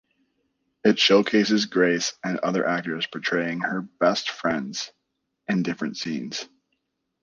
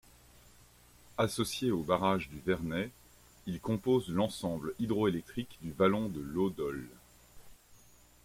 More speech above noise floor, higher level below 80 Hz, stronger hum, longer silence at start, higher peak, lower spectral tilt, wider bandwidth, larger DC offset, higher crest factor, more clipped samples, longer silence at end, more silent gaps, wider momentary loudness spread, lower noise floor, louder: first, 54 dB vs 28 dB; second, -68 dBFS vs -60 dBFS; second, none vs 60 Hz at -60 dBFS; second, 0.85 s vs 1.15 s; first, -4 dBFS vs -14 dBFS; second, -4 dB/octave vs -6 dB/octave; second, 9.6 kHz vs 16.5 kHz; neither; about the same, 20 dB vs 22 dB; neither; first, 0.75 s vs 0.5 s; neither; about the same, 13 LU vs 12 LU; first, -78 dBFS vs -60 dBFS; first, -24 LUFS vs -33 LUFS